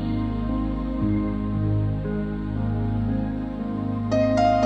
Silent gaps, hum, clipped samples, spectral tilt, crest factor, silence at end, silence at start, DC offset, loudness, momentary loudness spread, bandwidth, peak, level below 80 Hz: none; none; under 0.1%; -8.5 dB/octave; 14 dB; 0 s; 0 s; under 0.1%; -25 LUFS; 7 LU; 7.8 kHz; -8 dBFS; -34 dBFS